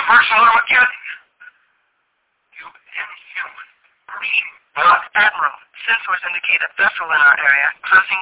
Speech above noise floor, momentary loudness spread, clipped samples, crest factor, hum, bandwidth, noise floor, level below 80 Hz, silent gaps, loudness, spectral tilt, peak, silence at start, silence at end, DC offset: 53 dB; 17 LU; under 0.1%; 16 dB; none; 4 kHz; -68 dBFS; -62 dBFS; none; -14 LUFS; -3.5 dB/octave; -2 dBFS; 0 s; 0 s; under 0.1%